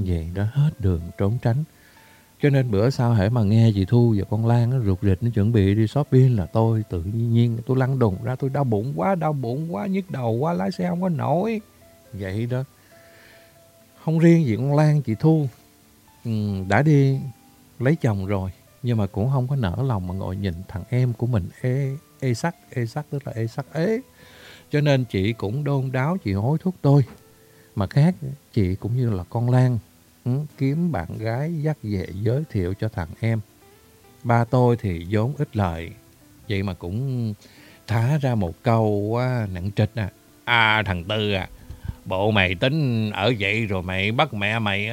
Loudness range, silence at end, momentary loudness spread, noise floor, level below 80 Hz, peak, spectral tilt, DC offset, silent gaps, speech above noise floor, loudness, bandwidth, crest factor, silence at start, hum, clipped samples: 6 LU; 0 s; 10 LU; -54 dBFS; -48 dBFS; -2 dBFS; -7.5 dB/octave; under 0.1%; none; 32 dB; -22 LUFS; 15.5 kHz; 20 dB; 0 s; none; under 0.1%